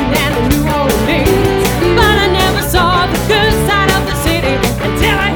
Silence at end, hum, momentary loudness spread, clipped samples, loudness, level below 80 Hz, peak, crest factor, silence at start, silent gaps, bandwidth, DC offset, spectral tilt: 0 s; none; 4 LU; under 0.1%; -12 LUFS; -22 dBFS; 0 dBFS; 12 dB; 0 s; none; over 20 kHz; under 0.1%; -4.5 dB/octave